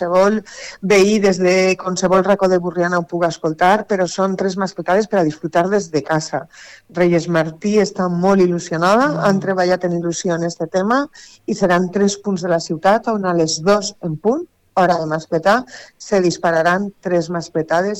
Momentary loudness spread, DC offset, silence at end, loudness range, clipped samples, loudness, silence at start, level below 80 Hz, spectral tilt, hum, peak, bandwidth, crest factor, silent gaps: 8 LU; under 0.1%; 0 s; 3 LU; under 0.1%; -17 LUFS; 0 s; -54 dBFS; -5.5 dB/octave; none; -4 dBFS; 13.5 kHz; 12 dB; none